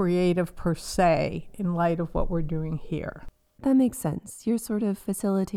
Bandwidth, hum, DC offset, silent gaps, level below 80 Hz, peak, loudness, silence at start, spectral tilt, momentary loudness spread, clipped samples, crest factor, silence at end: 15.5 kHz; none; under 0.1%; none; -40 dBFS; -10 dBFS; -27 LUFS; 0 s; -6.5 dB/octave; 9 LU; under 0.1%; 16 dB; 0 s